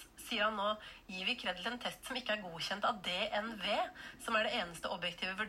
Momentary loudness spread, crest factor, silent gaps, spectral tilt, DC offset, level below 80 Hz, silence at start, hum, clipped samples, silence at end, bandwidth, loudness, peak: 7 LU; 18 dB; none; -3 dB/octave; under 0.1%; -66 dBFS; 0 s; none; under 0.1%; 0 s; 16 kHz; -37 LUFS; -20 dBFS